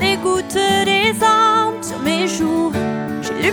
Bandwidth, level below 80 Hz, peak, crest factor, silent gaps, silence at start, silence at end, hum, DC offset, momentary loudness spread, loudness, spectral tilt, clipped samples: over 20 kHz; -48 dBFS; -4 dBFS; 14 dB; none; 0 s; 0 s; none; under 0.1%; 9 LU; -16 LUFS; -3.5 dB/octave; under 0.1%